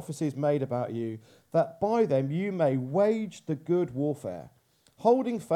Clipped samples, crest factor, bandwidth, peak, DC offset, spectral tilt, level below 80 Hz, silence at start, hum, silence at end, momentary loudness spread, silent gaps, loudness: under 0.1%; 18 dB; 14.5 kHz; -10 dBFS; under 0.1%; -8 dB/octave; -70 dBFS; 0 s; none; 0 s; 11 LU; none; -28 LUFS